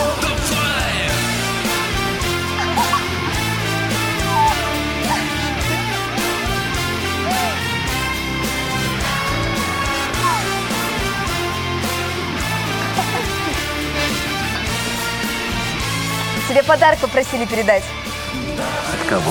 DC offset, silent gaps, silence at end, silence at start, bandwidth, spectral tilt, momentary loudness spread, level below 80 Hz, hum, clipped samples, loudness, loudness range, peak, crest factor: under 0.1%; none; 0 s; 0 s; 17.5 kHz; -3.5 dB/octave; 4 LU; -34 dBFS; none; under 0.1%; -19 LUFS; 3 LU; -2 dBFS; 18 dB